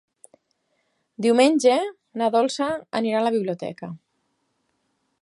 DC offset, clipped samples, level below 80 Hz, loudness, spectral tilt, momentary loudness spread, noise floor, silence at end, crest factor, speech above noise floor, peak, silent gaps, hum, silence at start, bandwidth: under 0.1%; under 0.1%; -72 dBFS; -22 LUFS; -4.5 dB/octave; 16 LU; -72 dBFS; 1.25 s; 20 dB; 51 dB; -4 dBFS; none; none; 1.2 s; 11.5 kHz